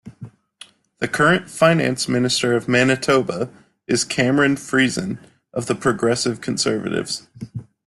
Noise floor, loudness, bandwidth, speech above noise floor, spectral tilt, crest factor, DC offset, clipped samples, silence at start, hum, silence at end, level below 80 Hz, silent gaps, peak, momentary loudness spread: -47 dBFS; -19 LUFS; 12.5 kHz; 28 dB; -4.5 dB/octave; 18 dB; under 0.1%; under 0.1%; 0.05 s; none; 0.25 s; -56 dBFS; none; -2 dBFS; 13 LU